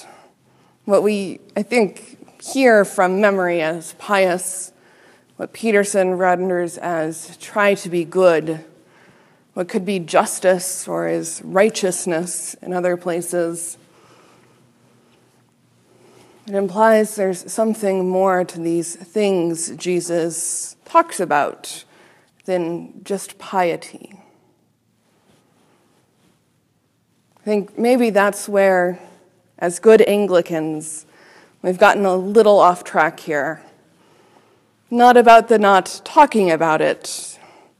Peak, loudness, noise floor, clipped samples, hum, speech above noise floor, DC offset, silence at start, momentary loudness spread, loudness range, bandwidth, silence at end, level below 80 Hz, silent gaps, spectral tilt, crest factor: 0 dBFS; -17 LUFS; -63 dBFS; under 0.1%; none; 46 dB; under 0.1%; 0.85 s; 15 LU; 11 LU; 15 kHz; 0.45 s; -66 dBFS; none; -4.5 dB/octave; 18 dB